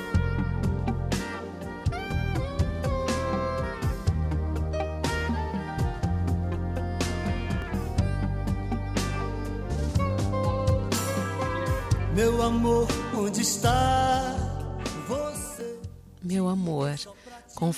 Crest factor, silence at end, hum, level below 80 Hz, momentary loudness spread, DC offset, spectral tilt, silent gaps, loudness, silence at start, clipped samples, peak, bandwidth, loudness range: 14 dB; 0 s; none; -36 dBFS; 9 LU; under 0.1%; -5.5 dB/octave; none; -28 LUFS; 0 s; under 0.1%; -12 dBFS; 15.5 kHz; 4 LU